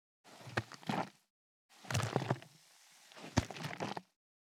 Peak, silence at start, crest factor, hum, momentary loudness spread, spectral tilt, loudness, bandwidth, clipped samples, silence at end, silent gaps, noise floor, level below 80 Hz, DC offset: -14 dBFS; 0.25 s; 28 dB; none; 23 LU; -5 dB/octave; -40 LUFS; 17 kHz; under 0.1%; 0.4 s; 1.30-1.69 s; -64 dBFS; -64 dBFS; under 0.1%